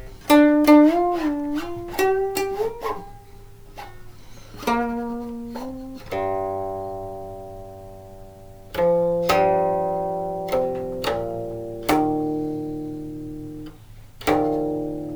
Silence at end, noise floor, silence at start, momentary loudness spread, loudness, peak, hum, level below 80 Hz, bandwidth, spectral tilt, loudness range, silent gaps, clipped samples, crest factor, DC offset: 0 s; -43 dBFS; 0 s; 21 LU; -22 LUFS; -4 dBFS; none; -46 dBFS; over 20 kHz; -5.5 dB/octave; 9 LU; none; under 0.1%; 20 dB; under 0.1%